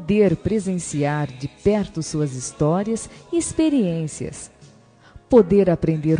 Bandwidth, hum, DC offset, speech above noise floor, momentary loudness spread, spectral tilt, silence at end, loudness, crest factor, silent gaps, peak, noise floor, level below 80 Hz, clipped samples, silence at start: 10 kHz; none; under 0.1%; 30 dB; 12 LU; -6.5 dB/octave; 0 s; -21 LUFS; 18 dB; none; -2 dBFS; -50 dBFS; -46 dBFS; under 0.1%; 0 s